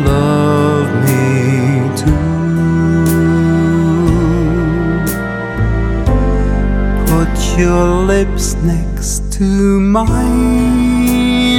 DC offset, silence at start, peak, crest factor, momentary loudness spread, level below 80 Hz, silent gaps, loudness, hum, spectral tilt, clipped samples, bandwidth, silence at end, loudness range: under 0.1%; 0 s; 0 dBFS; 12 dB; 4 LU; -18 dBFS; none; -13 LUFS; none; -6.5 dB/octave; under 0.1%; 18.5 kHz; 0 s; 2 LU